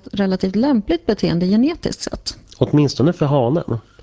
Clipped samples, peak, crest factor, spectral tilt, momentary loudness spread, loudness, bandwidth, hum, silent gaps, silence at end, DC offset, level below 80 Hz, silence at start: under 0.1%; 0 dBFS; 18 dB; -7 dB/octave; 9 LU; -18 LUFS; 8 kHz; none; none; 0.25 s; under 0.1%; -42 dBFS; 0.15 s